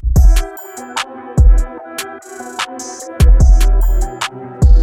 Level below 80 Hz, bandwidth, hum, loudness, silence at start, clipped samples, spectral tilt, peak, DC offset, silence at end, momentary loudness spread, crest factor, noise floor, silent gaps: -12 dBFS; 17.5 kHz; none; -15 LUFS; 0.05 s; under 0.1%; -5.5 dB/octave; 0 dBFS; under 0.1%; 0 s; 16 LU; 12 dB; -30 dBFS; none